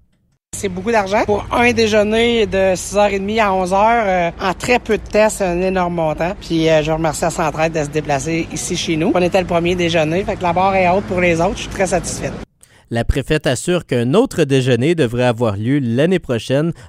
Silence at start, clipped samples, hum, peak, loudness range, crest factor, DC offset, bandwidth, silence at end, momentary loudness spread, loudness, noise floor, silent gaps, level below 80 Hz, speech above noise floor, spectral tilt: 0.55 s; under 0.1%; none; 0 dBFS; 3 LU; 16 dB; under 0.1%; 15.5 kHz; 0 s; 6 LU; -16 LUFS; -60 dBFS; none; -34 dBFS; 44 dB; -5 dB/octave